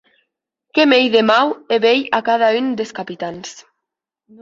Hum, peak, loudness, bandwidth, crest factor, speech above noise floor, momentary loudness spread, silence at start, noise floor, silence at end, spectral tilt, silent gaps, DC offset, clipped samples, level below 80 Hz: none; -2 dBFS; -16 LUFS; 7.8 kHz; 16 dB; 65 dB; 14 LU; 0.75 s; -81 dBFS; 0.8 s; -4 dB/octave; none; under 0.1%; under 0.1%; -64 dBFS